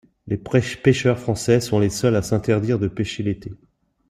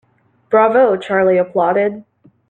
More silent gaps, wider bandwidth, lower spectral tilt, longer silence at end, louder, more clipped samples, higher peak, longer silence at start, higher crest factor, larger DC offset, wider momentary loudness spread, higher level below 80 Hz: neither; first, 15.5 kHz vs 8.8 kHz; second, -6 dB/octave vs -7.5 dB/octave; about the same, 0.55 s vs 0.5 s; second, -21 LUFS vs -14 LUFS; neither; about the same, -2 dBFS vs -2 dBFS; second, 0.25 s vs 0.5 s; about the same, 18 dB vs 14 dB; neither; first, 10 LU vs 7 LU; first, -48 dBFS vs -64 dBFS